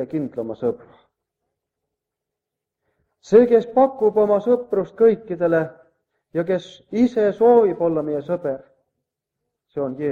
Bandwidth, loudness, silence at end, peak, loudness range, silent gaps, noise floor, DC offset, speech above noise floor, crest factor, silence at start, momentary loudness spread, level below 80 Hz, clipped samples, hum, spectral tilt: 7.2 kHz; -19 LUFS; 0 s; -2 dBFS; 4 LU; none; -84 dBFS; under 0.1%; 65 dB; 18 dB; 0 s; 14 LU; -62 dBFS; under 0.1%; none; -8 dB/octave